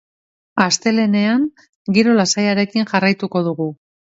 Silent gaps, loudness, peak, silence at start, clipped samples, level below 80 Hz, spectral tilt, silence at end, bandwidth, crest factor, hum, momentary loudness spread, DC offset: 1.69-1.85 s; -17 LUFS; 0 dBFS; 0.55 s; under 0.1%; -62 dBFS; -4.5 dB/octave; 0.3 s; 8 kHz; 18 dB; none; 10 LU; under 0.1%